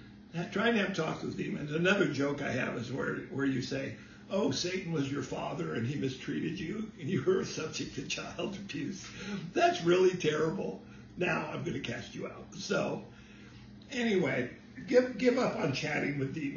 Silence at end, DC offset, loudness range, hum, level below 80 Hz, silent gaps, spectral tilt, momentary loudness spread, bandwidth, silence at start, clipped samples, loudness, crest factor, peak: 0 s; under 0.1%; 4 LU; none; -62 dBFS; none; -5.5 dB/octave; 14 LU; 7.4 kHz; 0 s; under 0.1%; -33 LUFS; 20 dB; -14 dBFS